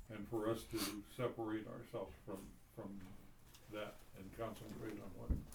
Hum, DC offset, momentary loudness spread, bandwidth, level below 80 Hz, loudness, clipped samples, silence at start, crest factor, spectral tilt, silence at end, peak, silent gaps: none; under 0.1%; 15 LU; over 20 kHz; -56 dBFS; -47 LUFS; under 0.1%; 0 s; 20 dB; -5.5 dB/octave; 0 s; -28 dBFS; none